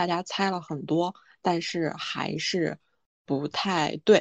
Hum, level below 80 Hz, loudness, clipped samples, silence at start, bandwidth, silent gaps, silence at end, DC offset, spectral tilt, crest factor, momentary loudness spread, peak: none; -70 dBFS; -28 LUFS; under 0.1%; 0 s; 8.6 kHz; 3.06-3.25 s; 0 s; under 0.1%; -5 dB/octave; 22 dB; 6 LU; -6 dBFS